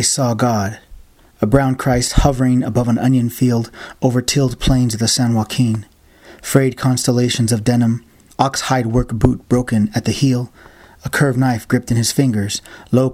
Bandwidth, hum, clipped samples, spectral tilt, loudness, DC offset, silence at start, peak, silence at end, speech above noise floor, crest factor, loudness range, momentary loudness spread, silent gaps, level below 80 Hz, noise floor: 16 kHz; none; under 0.1%; -5.5 dB/octave; -16 LUFS; under 0.1%; 0 s; 0 dBFS; 0 s; 28 dB; 16 dB; 2 LU; 7 LU; none; -30 dBFS; -44 dBFS